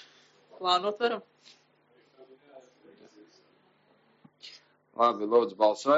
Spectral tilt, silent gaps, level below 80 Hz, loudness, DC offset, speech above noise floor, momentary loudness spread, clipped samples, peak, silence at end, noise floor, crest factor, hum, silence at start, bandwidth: -1.5 dB/octave; none; under -90 dBFS; -27 LUFS; under 0.1%; 39 dB; 24 LU; under 0.1%; -10 dBFS; 0 s; -66 dBFS; 20 dB; none; 0.6 s; 7.6 kHz